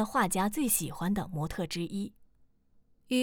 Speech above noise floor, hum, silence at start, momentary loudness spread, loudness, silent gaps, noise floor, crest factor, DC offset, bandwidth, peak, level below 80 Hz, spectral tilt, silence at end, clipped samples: 33 dB; none; 0 s; 9 LU; -31 LUFS; none; -65 dBFS; 16 dB; under 0.1%; over 20 kHz; -16 dBFS; -54 dBFS; -4 dB/octave; 0 s; under 0.1%